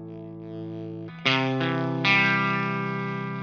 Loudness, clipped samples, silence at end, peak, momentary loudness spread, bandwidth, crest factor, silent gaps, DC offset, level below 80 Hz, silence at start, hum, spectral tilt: -24 LUFS; under 0.1%; 0 s; -4 dBFS; 18 LU; 7 kHz; 22 dB; none; under 0.1%; -68 dBFS; 0 s; none; -6 dB/octave